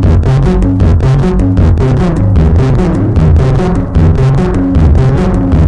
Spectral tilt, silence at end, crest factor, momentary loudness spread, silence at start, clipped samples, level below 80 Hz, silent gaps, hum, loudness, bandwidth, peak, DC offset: -9 dB/octave; 0 s; 8 dB; 2 LU; 0 s; under 0.1%; -14 dBFS; none; none; -9 LUFS; 9 kHz; 0 dBFS; under 0.1%